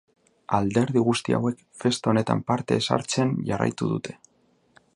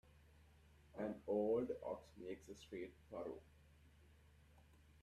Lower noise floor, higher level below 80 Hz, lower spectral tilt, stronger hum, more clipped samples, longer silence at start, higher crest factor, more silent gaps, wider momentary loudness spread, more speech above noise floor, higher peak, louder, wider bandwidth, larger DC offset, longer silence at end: second, -60 dBFS vs -68 dBFS; first, -58 dBFS vs -72 dBFS; second, -5.5 dB/octave vs -7 dB/octave; neither; neither; first, 0.5 s vs 0.05 s; about the same, 20 dB vs 20 dB; neither; second, 6 LU vs 14 LU; first, 36 dB vs 17 dB; first, -4 dBFS vs -28 dBFS; first, -25 LUFS vs -46 LUFS; second, 11.5 kHz vs 13.5 kHz; neither; first, 0.8 s vs 0.05 s